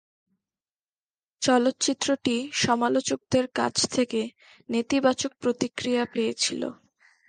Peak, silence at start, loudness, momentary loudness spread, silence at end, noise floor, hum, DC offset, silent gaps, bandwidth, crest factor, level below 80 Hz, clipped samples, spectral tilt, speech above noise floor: -8 dBFS; 1.4 s; -25 LUFS; 7 LU; 0.55 s; under -90 dBFS; none; under 0.1%; none; 10 kHz; 18 dB; -62 dBFS; under 0.1%; -3 dB/octave; over 65 dB